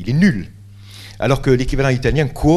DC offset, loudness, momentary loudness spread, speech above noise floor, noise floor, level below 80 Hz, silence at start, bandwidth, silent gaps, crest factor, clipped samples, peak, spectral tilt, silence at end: under 0.1%; -17 LUFS; 21 LU; 22 dB; -37 dBFS; -28 dBFS; 0 s; 13 kHz; none; 16 dB; under 0.1%; 0 dBFS; -7 dB/octave; 0 s